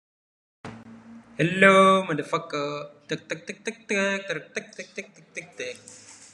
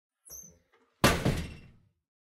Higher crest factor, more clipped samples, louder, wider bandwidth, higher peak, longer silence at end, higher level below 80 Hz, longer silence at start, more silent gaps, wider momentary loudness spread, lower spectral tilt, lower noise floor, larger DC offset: about the same, 24 dB vs 24 dB; neither; first, -23 LUFS vs -28 LUFS; second, 11 kHz vs 16 kHz; first, -2 dBFS vs -8 dBFS; second, 0.2 s vs 0.7 s; second, -70 dBFS vs -44 dBFS; first, 0.65 s vs 0.3 s; neither; first, 25 LU vs 21 LU; about the same, -4.5 dB/octave vs -4.5 dB/octave; second, -47 dBFS vs -67 dBFS; neither